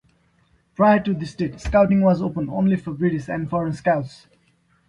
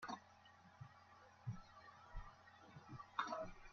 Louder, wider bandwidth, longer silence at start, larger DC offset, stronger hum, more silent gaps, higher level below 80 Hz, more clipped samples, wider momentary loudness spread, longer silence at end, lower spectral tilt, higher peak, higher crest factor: first, -21 LUFS vs -53 LUFS; first, 9.6 kHz vs 7 kHz; first, 0.8 s vs 0 s; neither; neither; neither; first, -42 dBFS vs -64 dBFS; neither; second, 10 LU vs 19 LU; first, 0.75 s vs 0 s; first, -8.5 dB/octave vs -4 dB/octave; first, -6 dBFS vs -28 dBFS; second, 16 dB vs 26 dB